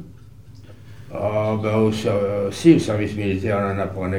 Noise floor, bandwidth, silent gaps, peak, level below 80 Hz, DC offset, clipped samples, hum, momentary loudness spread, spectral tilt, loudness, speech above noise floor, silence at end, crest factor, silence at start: -43 dBFS; 13.5 kHz; none; -2 dBFS; -52 dBFS; 0.7%; under 0.1%; none; 9 LU; -7 dB/octave; -20 LUFS; 24 dB; 0 s; 20 dB; 0 s